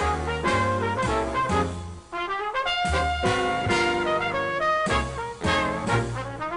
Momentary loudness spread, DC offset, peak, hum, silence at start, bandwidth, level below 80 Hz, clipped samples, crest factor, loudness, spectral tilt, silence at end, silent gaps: 8 LU; under 0.1%; -10 dBFS; none; 0 s; 11 kHz; -38 dBFS; under 0.1%; 14 dB; -25 LUFS; -5 dB/octave; 0 s; none